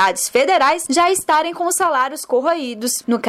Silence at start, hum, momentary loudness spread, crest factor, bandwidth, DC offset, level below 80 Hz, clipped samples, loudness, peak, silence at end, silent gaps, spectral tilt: 0 s; none; 6 LU; 12 dB; 16 kHz; under 0.1%; -58 dBFS; under 0.1%; -17 LUFS; -6 dBFS; 0 s; none; -1.5 dB/octave